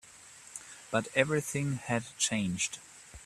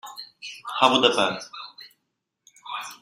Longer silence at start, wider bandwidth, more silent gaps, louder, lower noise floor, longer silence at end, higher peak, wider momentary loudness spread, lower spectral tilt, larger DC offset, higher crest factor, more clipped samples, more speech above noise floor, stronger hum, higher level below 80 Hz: about the same, 0.05 s vs 0.05 s; second, 14 kHz vs 16 kHz; neither; second, -31 LUFS vs -22 LUFS; second, -53 dBFS vs -79 dBFS; about the same, 0 s vs 0.05 s; second, -8 dBFS vs -2 dBFS; second, 18 LU vs 21 LU; about the same, -3.5 dB/octave vs -2.5 dB/octave; neither; about the same, 26 dB vs 24 dB; neither; second, 22 dB vs 57 dB; neither; first, -64 dBFS vs -72 dBFS